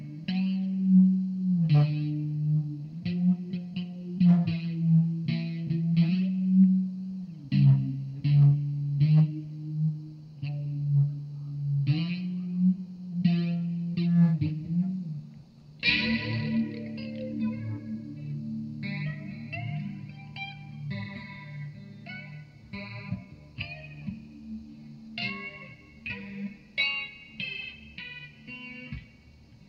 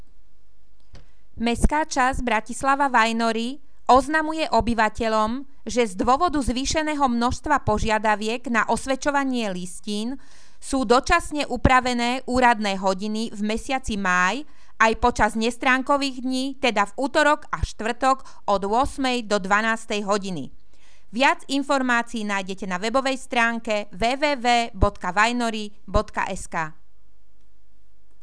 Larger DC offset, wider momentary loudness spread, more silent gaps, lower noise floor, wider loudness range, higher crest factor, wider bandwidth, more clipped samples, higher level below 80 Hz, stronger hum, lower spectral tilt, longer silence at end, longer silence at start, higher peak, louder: second, under 0.1% vs 2%; first, 19 LU vs 9 LU; neither; second, -54 dBFS vs -61 dBFS; first, 14 LU vs 3 LU; about the same, 20 dB vs 22 dB; second, 5.8 kHz vs 11 kHz; neither; second, -60 dBFS vs -38 dBFS; neither; first, -9 dB/octave vs -4 dB/octave; second, 0.05 s vs 1.5 s; about the same, 0 s vs 0.1 s; second, -8 dBFS vs -2 dBFS; second, -28 LUFS vs -22 LUFS